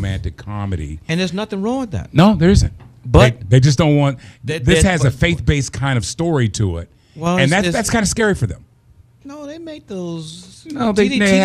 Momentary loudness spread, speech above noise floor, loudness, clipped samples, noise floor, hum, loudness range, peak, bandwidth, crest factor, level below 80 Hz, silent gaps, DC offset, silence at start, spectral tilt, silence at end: 19 LU; 33 dB; -16 LUFS; under 0.1%; -49 dBFS; none; 6 LU; 0 dBFS; 13.5 kHz; 16 dB; -30 dBFS; none; under 0.1%; 0 s; -5.5 dB/octave; 0 s